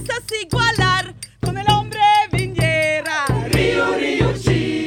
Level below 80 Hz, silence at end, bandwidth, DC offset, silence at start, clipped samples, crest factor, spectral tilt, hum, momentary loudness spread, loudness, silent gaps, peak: -34 dBFS; 0 s; 16 kHz; under 0.1%; 0 s; under 0.1%; 16 dB; -5 dB/octave; 50 Hz at -50 dBFS; 8 LU; -18 LUFS; none; -2 dBFS